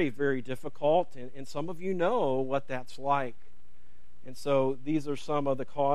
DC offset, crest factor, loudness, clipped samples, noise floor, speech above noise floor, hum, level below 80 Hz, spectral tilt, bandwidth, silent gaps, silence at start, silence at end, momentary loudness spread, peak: 2%; 16 dB; -31 LUFS; under 0.1%; -63 dBFS; 32 dB; none; -64 dBFS; -6.5 dB/octave; 13 kHz; none; 0 s; 0 s; 12 LU; -14 dBFS